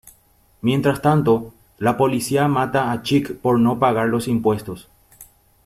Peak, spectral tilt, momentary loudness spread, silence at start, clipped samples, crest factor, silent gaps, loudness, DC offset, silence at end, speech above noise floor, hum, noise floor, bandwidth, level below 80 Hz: -2 dBFS; -6.5 dB/octave; 7 LU; 0.05 s; under 0.1%; 18 dB; none; -19 LUFS; under 0.1%; 0.45 s; 38 dB; none; -56 dBFS; 15.5 kHz; -52 dBFS